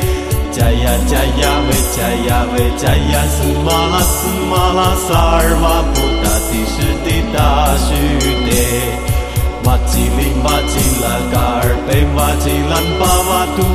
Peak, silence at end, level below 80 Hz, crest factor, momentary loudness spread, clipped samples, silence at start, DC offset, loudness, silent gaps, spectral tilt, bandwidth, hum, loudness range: 0 dBFS; 0 s; -18 dBFS; 12 dB; 4 LU; under 0.1%; 0 s; under 0.1%; -14 LUFS; none; -4.5 dB/octave; 14.5 kHz; none; 1 LU